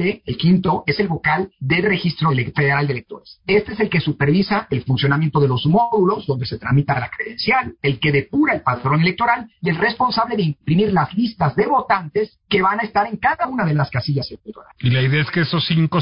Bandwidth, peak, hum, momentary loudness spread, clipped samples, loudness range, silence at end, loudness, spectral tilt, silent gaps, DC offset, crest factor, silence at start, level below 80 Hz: 5.4 kHz; -4 dBFS; none; 6 LU; under 0.1%; 1 LU; 0 s; -18 LUFS; -11 dB/octave; none; under 0.1%; 14 dB; 0 s; -48 dBFS